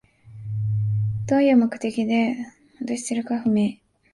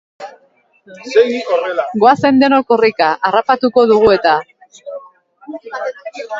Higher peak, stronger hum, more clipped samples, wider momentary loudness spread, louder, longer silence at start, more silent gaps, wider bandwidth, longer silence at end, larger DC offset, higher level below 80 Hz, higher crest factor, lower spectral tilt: second, -8 dBFS vs 0 dBFS; neither; neither; second, 15 LU vs 22 LU; second, -23 LUFS vs -13 LUFS; about the same, 0.25 s vs 0.2 s; neither; first, 11.5 kHz vs 7.6 kHz; first, 0.4 s vs 0 s; neither; about the same, -54 dBFS vs -52 dBFS; about the same, 14 dB vs 14 dB; first, -7 dB/octave vs -5.5 dB/octave